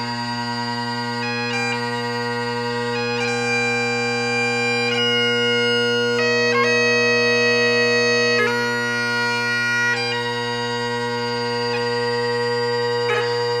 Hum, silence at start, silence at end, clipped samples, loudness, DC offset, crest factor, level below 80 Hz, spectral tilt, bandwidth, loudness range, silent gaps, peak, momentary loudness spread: none; 0 s; 0 s; under 0.1%; -19 LUFS; under 0.1%; 14 dB; -58 dBFS; -3.5 dB/octave; 14 kHz; 5 LU; none; -6 dBFS; 7 LU